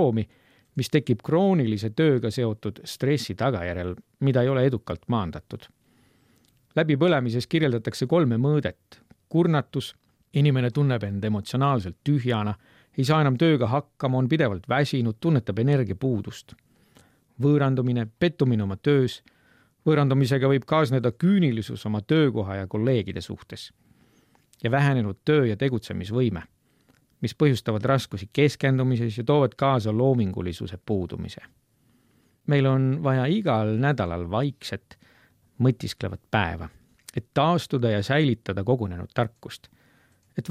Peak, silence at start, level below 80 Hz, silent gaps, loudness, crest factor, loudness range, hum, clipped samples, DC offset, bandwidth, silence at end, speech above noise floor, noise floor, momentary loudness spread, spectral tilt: -6 dBFS; 0 s; -56 dBFS; none; -24 LUFS; 18 dB; 4 LU; none; under 0.1%; under 0.1%; 14 kHz; 0 s; 40 dB; -64 dBFS; 13 LU; -7.5 dB/octave